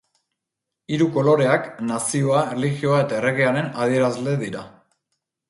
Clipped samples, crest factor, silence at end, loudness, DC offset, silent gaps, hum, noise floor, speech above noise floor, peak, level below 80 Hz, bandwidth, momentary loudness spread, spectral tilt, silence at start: under 0.1%; 16 dB; 0.8 s; -21 LUFS; under 0.1%; none; none; -83 dBFS; 63 dB; -4 dBFS; -62 dBFS; 11.5 kHz; 9 LU; -5.5 dB/octave; 0.9 s